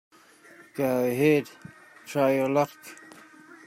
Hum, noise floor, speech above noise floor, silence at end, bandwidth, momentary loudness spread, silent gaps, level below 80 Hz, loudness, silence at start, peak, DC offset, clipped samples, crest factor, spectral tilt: none; -53 dBFS; 28 dB; 0.7 s; 16 kHz; 22 LU; none; -72 dBFS; -25 LUFS; 0.75 s; -10 dBFS; under 0.1%; under 0.1%; 18 dB; -6.5 dB/octave